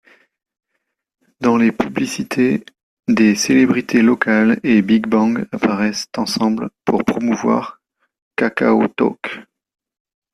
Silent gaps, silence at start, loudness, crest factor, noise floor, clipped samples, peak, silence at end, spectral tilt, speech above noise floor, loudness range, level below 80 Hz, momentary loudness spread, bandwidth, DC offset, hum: 2.83-2.97 s, 8.22-8.31 s; 1.4 s; -16 LUFS; 16 dB; -74 dBFS; under 0.1%; -2 dBFS; 0.9 s; -5 dB/octave; 58 dB; 5 LU; -56 dBFS; 8 LU; 13.5 kHz; under 0.1%; none